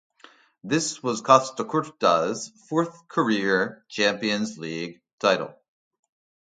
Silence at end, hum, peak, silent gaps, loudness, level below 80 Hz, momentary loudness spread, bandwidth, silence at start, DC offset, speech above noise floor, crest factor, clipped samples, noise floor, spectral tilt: 0.95 s; none; 0 dBFS; 5.13-5.18 s; -24 LUFS; -70 dBFS; 13 LU; 9.6 kHz; 0.65 s; under 0.1%; 30 dB; 24 dB; under 0.1%; -54 dBFS; -4 dB/octave